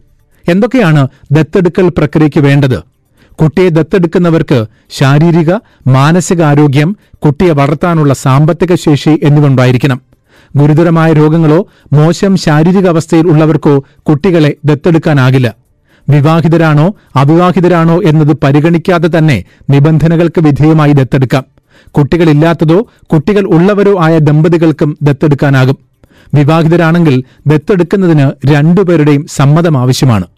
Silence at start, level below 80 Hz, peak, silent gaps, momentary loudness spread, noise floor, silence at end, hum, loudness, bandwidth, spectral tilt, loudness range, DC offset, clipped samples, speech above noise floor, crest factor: 0.45 s; -36 dBFS; 0 dBFS; none; 5 LU; -44 dBFS; 0.15 s; none; -8 LUFS; 12.5 kHz; -7.5 dB/octave; 2 LU; 0.6%; under 0.1%; 38 dB; 6 dB